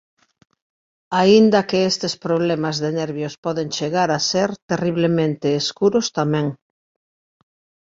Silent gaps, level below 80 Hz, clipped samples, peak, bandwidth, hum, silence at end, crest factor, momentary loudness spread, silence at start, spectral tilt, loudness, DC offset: 3.38-3.43 s, 4.62-4.69 s; -60 dBFS; under 0.1%; -2 dBFS; 7.8 kHz; none; 1.35 s; 18 dB; 10 LU; 1.1 s; -5 dB/octave; -19 LUFS; under 0.1%